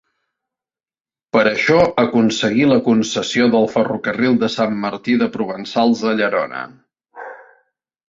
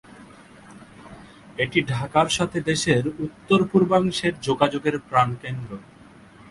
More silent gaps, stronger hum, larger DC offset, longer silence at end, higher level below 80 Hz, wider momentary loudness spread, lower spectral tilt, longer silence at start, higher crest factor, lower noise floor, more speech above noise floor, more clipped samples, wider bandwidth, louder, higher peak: neither; neither; neither; about the same, 0.75 s vs 0.7 s; about the same, -56 dBFS vs -54 dBFS; about the same, 12 LU vs 14 LU; about the same, -5 dB/octave vs -5 dB/octave; first, 1.35 s vs 0.2 s; second, 16 dB vs 22 dB; first, under -90 dBFS vs -48 dBFS; first, over 74 dB vs 26 dB; neither; second, 7.8 kHz vs 11.5 kHz; first, -16 LUFS vs -22 LUFS; about the same, -2 dBFS vs -2 dBFS